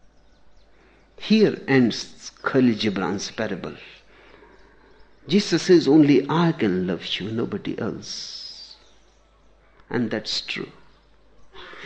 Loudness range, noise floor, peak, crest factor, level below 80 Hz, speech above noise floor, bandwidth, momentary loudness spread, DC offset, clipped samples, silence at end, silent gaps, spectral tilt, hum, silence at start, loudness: 10 LU; -56 dBFS; -6 dBFS; 18 dB; -58 dBFS; 35 dB; 8.8 kHz; 19 LU; under 0.1%; under 0.1%; 0 s; none; -5.5 dB/octave; none; 1.2 s; -22 LUFS